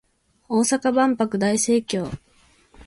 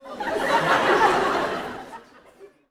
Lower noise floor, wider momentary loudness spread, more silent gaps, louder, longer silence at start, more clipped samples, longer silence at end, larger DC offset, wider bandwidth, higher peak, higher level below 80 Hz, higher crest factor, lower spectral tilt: first, -58 dBFS vs -50 dBFS; second, 9 LU vs 17 LU; neither; about the same, -21 LUFS vs -21 LUFS; first, 0.5 s vs 0.05 s; neither; second, 0.05 s vs 0.25 s; neither; second, 11.5 kHz vs 17.5 kHz; about the same, -8 dBFS vs -6 dBFS; about the same, -54 dBFS vs -54 dBFS; about the same, 16 dB vs 18 dB; about the same, -4 dB/octave vs -4 dB/octave